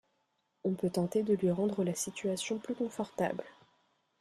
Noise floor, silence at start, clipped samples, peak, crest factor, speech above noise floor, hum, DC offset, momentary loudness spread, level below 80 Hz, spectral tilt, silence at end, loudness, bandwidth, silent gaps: -78 dBFS; 0.65 s; under 0.1%; -18 dBFS; 16 dB; 45 dB; none; under 0.1%; 7 LU; -72 dBFS; -5.5 dB/octave; 0.7 s; -34 LUFS; 14.5 kHz; none